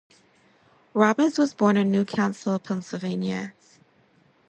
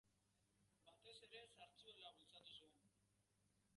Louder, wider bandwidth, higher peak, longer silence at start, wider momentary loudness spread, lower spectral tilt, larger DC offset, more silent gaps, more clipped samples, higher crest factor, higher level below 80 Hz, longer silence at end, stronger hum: first, -24 LUFS vs -64 LUFS; second, 8.8 kHz vs 11 kHz; first, -6 dBFS vs -48 dBFS; first, 0.95 s vs 0.05 s; first, 11 LU vs 4 LU; first, -6.5 dB/octave vs -2 dB/octave; neither; neither; neither; about the same, 18 dB vs 20 dB; first, -70 dBFS vs under -90 dBFS; first, 1 s vs 0 s; second, none vs 50 Hz at -85 dBFS